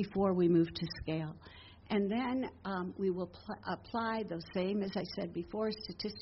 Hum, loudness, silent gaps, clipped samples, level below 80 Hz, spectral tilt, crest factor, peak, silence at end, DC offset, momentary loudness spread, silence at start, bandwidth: none; -36 LUFS; none; under 0.1%; -60 dBFS; -5.5 dB/octave; 16 dB; -20 dBFS; 0 s; under 0.1%; 11 LU; 0 s; 5.8 kHz